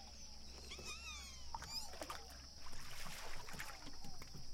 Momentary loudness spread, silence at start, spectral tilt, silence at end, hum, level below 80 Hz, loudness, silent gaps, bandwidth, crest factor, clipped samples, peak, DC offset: 8 LU; 0 s; -2 dB/octave; 0 s; none; -56 dBFS; -51 LUFS; none; 16.5 kHz; 16 dB; under 0.1%; -32 dBFS; under 0.1%